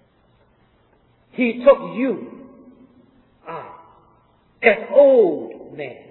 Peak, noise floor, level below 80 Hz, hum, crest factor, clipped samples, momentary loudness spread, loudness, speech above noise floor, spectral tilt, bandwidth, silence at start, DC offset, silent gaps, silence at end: 0 dBFS; -58 dBFS; -62 dBFS; none; 20 dB; under 0.1%; 22 LU; -17 LUFS; 42 dB; -9.5 dB/octave; 4.2 kHz; 1.4 s; under 0.1%; none; 0.15 s